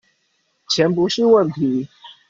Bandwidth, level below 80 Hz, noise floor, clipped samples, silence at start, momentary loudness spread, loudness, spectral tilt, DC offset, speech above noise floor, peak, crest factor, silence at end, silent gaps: 7.6 kHz; -60 dBFS; -66 dBFS; under 0.1%; 0.7 s; 10 LU; -17 LUFS; -5.5 dB/octave; under 0.1%; 50 dB; -4 dBFS; 16 dB; 0.2 s; none